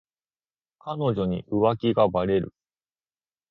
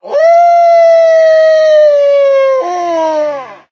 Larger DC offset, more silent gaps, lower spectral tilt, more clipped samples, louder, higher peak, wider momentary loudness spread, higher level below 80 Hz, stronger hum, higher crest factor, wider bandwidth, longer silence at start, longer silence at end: neither; neither; first, -10 dB/octave vs -2.5 dB/octave; neither; second, -24 LUFS vs -8 LUFS; second, -6 dBFS vs 0 dBFS; first, 14 LU vs 8 LU; first, -54 dBFS vs -72 dBFS; neither; first, 20 dB vs 8 dB; second, 5.6 kHz vs 6.8 kHz; first, 0.85 s vs 0.05 s; first, 1 s vs 0.15 s